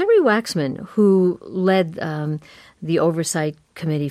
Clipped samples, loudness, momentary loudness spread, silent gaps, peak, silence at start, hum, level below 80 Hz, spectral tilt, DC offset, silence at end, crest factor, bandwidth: under 0.1%; -20 LUFS; 12 LU; none; -6 dBFS; 0 s; none; -62 dBFS; -6 dB/octave; under 0.1%; 0 s; 14 dB; 14.5 kHz